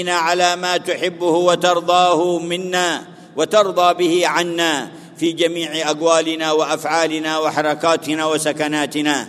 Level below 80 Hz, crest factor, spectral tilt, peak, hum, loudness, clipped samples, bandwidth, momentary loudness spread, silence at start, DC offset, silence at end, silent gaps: -70 dBFS; 18 dB; -3 dB/octave; 0 dBFS; none; -17 LUFS; under 0.1%; 13.5 kHz; 6 LU; 0 s; under 0.1%; 0 s; none